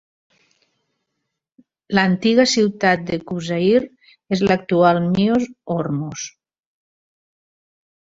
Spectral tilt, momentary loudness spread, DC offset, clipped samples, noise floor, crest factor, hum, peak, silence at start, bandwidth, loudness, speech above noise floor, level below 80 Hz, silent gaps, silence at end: -5.5 dB/octave; 10 LU; under 0.1%; under 0.1%; -78 dBFS; 18 dB; none; -2 dBFS; 1.9 s; 7.8 kHz; -18 LUFS; 60 dB; -56 dBFS; none; 1.9 s